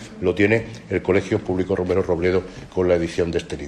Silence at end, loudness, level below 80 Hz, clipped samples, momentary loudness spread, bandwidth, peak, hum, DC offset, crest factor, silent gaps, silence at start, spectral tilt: 0 s; -21 LUFS; -48 dBFS; under 0.1%; 6 LU; 11 kHz; -4 dBFS; none; under 0.1%; 16 dB; none; 0 s; -7 dB/octave